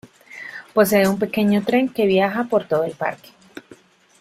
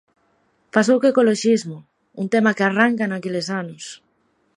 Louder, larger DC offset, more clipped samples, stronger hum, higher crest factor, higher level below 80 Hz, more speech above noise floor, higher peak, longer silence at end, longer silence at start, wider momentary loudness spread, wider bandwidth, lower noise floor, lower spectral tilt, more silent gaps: about the same, -19 LUFS vs -19 LUFS; neither; neither; neither; about the same, 18 dB vs 20 dB; first, -60 dBFS vs -70 dBFS; second, 31 dB vs 46 dB; second, -4 dBFS vs 0 dBFS; about the same, 0.6 s vs 0.6 s; second, 0.3 s vs 0.75 s; about the same, 18 LU vs 18 LU; first, 15.5 kHz vs 11 kHz; second, -49 dBFS vs -65 dBFS; about the same, -5.5 dB/octave vs -5 dB/octave; neither